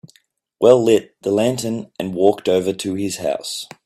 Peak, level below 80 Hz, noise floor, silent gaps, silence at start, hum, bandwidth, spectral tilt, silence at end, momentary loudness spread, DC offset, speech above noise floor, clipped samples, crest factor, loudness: 0 dBFS; -60 dBFS; -60 dBFS; none; 0.6 s; none; 15.5 kHz; -5 dB/octave; 0.2 s; 12 LU; under 0.1%; 42 dB; under 0.1%; 18 dB; -18 LUFS